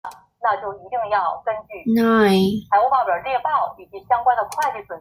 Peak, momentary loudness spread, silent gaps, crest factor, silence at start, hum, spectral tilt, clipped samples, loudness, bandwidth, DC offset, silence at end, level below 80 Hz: -4 dBFS; 11 LU; none; 16 dB; 0.05 s; none; -6 dB/octave; under 0.1%; -20 LUFS; 16 kHz; under 0.1%; 0 s; -56 dBFS